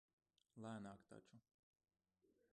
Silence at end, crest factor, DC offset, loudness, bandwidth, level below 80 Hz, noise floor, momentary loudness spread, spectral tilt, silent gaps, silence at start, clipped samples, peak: 0.25 s; 18 dB; under 0.1%; -58 LUFS; 10 kHz; -90 dBFS; -83 dBFS; 12 LU; -6.5 dB/octave; 1.54-1.73 s; 0.55 s; under 0.1%; -42 dBFS